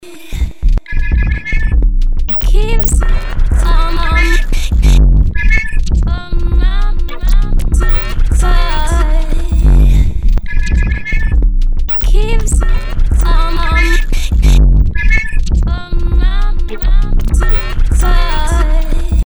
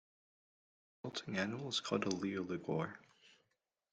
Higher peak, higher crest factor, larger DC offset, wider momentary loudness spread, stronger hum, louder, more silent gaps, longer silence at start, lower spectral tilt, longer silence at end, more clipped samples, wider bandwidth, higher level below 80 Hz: first, 0 dBFS vs -20 dBFS; second, 8 dB vs 22 dB; neither; second, 6 LU vs 9 LU; neither; first, -15 LUFS vs -40 LUFS; neither; second, 0.05 s vs 1.05 s; about the same, -5.5 dB/octave vs -4.5 dB/octave; second, 0.05 s vs 0.65 s; neither; first, over 20 kHz vs 9.4 kHz; first, -10 dBFS vs -78 dBFS